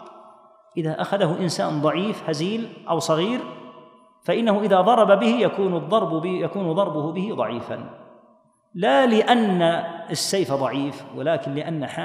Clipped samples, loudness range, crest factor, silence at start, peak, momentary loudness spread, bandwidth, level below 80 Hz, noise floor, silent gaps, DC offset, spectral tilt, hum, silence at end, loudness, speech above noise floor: under 0.1%; 5 LU; 20 dB; 0 s; -2 dBFS; 13 LU; 15.5 kHz; -74 dBFS; -58 dBFS; none; under 0.1%; -5.5 dB/octave; none; 0 s; -22 LUFS; 36 dB